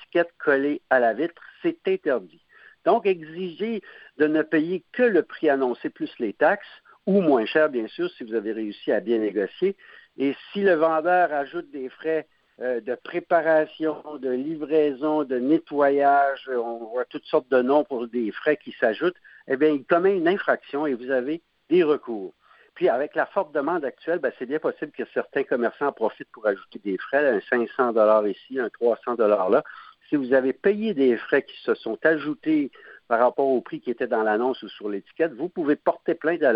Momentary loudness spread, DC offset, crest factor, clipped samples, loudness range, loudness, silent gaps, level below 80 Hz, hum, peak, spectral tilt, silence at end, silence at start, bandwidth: 10 LU; under 0.1%; 18 dB; under 0.1%; 3 LU; -24 LUFS; none; -74 dBFS; none; -4 dBFS; -9.5 dB/octave; 0 s; 0 s; 5.4 kHz